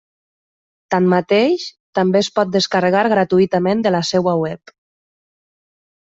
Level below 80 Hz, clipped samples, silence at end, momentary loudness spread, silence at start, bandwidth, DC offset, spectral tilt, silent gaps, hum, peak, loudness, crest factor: -58 dBFS; under 0.1%; 1.55 s; 7 LU; 0.9 s; 7.8 kHz; under 0.1%; -5.5 dB/octave; 1.80-1.93 s; none; -2 dBFS; -16 LUFS; 16 dB